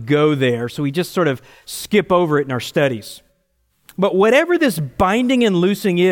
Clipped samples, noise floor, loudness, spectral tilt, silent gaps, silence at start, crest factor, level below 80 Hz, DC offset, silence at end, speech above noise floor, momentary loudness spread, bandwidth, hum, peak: under 0.1%; -65 dBFS; -17 LUFS; -6 dB/octave; none; 0 s; 16 dB; -48 dBFS; under 0.1%; 0 s; 48 dB; 14 LU; 17 kHz; none; -2 dBFS